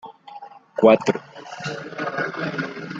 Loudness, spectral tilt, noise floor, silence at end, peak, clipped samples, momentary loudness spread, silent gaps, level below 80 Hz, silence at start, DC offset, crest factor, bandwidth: -22 LUFS; -6 dB/octave; -42 dBFS; 0 s; -2 dBFS; under 0.1%; 25 LU; none; -66 dBFS; 0.05 s; under 0.1%; 22 dB; 8 kHz